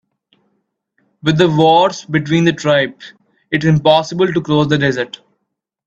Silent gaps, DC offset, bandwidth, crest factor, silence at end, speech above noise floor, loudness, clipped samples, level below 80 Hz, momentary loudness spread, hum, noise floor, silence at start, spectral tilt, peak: none; under 0.1%; 8 kHz; 16 dB; 0.8 s; 61 dB; -14 LUFS; under 0.1%; -52 dBFS; 10 LU; none; -74 dBFS; 1.25 s; -6 dB/octave; 0 dBFS